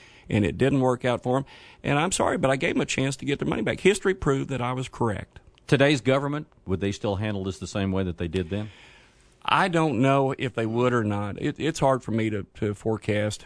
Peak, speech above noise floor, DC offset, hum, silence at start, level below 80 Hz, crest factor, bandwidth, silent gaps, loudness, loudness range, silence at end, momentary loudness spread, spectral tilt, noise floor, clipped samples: -4 dBFS; 31 dB; under 0.1%; none; 0.3 s; -50 dBFS; 22 dB; 11 kHz; none; -25 LUFS; 3 LU; 0 s; 9 LU; -5.5 dB/octave; -56 dBFS; under 0.1%